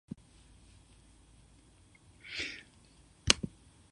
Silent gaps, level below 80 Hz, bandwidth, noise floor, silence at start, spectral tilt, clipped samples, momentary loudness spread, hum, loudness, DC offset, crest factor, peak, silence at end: none; -56 dBFS; 11 kHz; -62 dBFS; 2.25 s; -1.5 dB/octave; under 0.1%; 22 LU; none; -33 LUFS; under 0.1%; 40 dB; 0 dBFS; 0.45 s